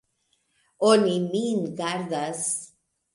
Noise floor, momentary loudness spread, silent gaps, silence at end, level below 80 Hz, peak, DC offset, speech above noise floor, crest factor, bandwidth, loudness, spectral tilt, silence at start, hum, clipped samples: -72 dBFS; 10 LU; none; 0.5 s; -74 dBFS; -6 dBFS; under 0.1%; 48 dB; 20 dB; 11.5 kHz; -25 LUFS; -4 dB/octave; 0.8 s; none; under 0.1%